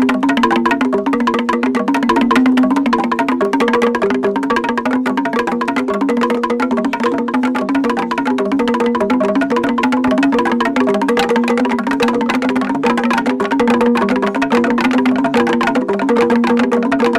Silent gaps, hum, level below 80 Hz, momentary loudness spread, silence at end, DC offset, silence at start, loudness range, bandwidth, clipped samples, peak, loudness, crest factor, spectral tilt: none; none; -48 dBFS; 3 LU; 0 s; under 0.1%; 0 s; 2 LU; 12.5 kHz; under 0.1%; -2 dBFS; -15 LUFS; 12 dB; -5.5 dB/octave